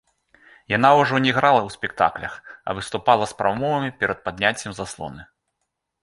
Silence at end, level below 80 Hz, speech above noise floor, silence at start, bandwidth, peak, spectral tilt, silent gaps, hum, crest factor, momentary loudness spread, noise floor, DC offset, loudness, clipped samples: 0.8 s; -54 dBFS; 57 dB; 0.7 s; 11.5 kHz; -2 dBFS; -5 dB/octave; none; none; 20 dB; 16 LU; -78 dBFS; under 0.1%; -21 LUFS; under 0.1%